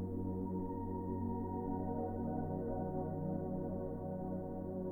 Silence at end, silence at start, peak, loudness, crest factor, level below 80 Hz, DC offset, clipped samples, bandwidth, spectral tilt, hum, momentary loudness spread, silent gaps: 0 s; 0 s; -26 dBFS; -41 LUFS; 14 dB; -54 dBFS; under 0.1%; under 0.1%; 2 kHz; -12.5 dB/octave; none; 3 LU; none